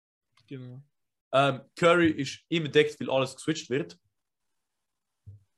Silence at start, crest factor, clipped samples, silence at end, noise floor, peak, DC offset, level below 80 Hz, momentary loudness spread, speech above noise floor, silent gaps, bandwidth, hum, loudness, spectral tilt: 0.5 s; 22 dB; under 0.1%; 0.25 s; -86 dBFS; -8 dBFS; under 0.1%; -68 dBFS; 21 LU; 59 dB; 1.21-1.31 s; 12 kHz; none; -26 LUFS; -5 dB/octave